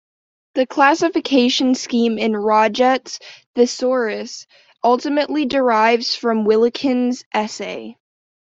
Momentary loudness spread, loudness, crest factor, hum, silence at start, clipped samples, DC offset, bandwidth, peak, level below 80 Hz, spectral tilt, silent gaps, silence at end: 13 LU; -17 LUFS; 16 dB; none; 0.55 s; under 0.1%; under 0.1%; 7.8 kHz; -2 dBFS; -64 dBFS; -3.5 dB/octave; 3.46-3.54 s, 7.26-7.31 s; 0.5 s